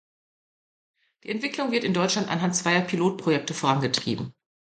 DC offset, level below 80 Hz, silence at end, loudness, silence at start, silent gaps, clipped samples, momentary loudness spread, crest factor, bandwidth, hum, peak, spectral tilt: under 0.1%; -66 dBFS; 0.45 s; -25 LUFS; 1.25 s; none; under 0.1%; 9 LU; 20 dB; 9.4 kHz; none; -8 dBFS; -4 dB/octave